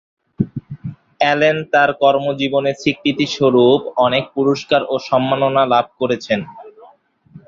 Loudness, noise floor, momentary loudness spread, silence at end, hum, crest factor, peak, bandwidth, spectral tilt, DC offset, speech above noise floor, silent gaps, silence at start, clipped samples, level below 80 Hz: -16 LUFS; -50 dBFS; 11 LU; 0.1 s; none; 16 dB; -2 dBFS; 7.6 kHz; -5.5 dB/octave; under 0.1%; 34 dB; none; 0.4 s; under 0.1%; -56 dBFS